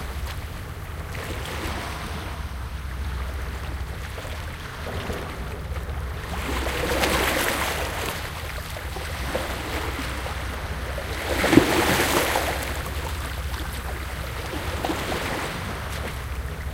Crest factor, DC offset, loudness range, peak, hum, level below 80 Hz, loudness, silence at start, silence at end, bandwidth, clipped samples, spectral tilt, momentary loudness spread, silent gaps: 26 dB; under 0.1%; 9 LU; 0 dBFS; none; -34 dBFS; -27 LUFS; 0 s; 0 s; 17 kHz; under 0.1%; -4 dB/octave; 12 LU; none